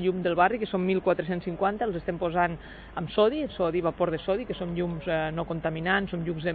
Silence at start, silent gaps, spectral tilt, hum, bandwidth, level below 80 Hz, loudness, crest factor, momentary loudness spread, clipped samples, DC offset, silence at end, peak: 0 s; none; -10 dB/octave; none; 4.8 kHz; -50 dBFS; -28 LUFS; 18 dB; 6 LU; under 0.1%; under 0.1%; 0 s; -10 dBFS